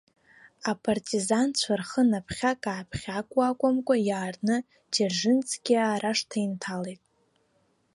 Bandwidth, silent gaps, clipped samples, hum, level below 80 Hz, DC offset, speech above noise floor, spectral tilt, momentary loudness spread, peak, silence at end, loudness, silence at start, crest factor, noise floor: 11.5 kHz; none; under 0.1%; none; -60 dBFS; under 0.1%; 43 dB; -4 dB/octave; 9 LU; -10 dBFS; 1 s; -27 LUFS; 0.65 s; 18 dB; -69 dBFS